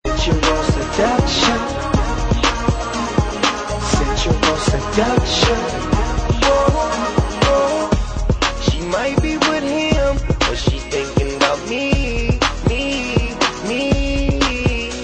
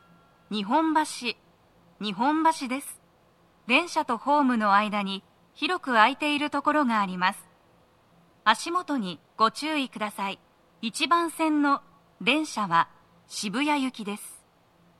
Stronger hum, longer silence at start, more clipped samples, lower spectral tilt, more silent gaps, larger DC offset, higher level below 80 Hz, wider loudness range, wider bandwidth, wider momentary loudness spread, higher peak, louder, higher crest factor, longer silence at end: neither; second, 0.05 s vs 0.5 s; neither; about the same, -4.5 dB/octave vs -3.5 dB/octave; neither; neither; first, -24 dBFS vs -74 dBFS; about the same, 2 LU vs 4 LU; second, 9.6 kHz vs 14 kHz; second, 5 LU vs 13 LU; first, 0 dBFS vs -6 dBFS; first, -17 LUFS vs -26 LUFS; second, 16 dB vs 22 dB; second, 0 s vs 0.65 s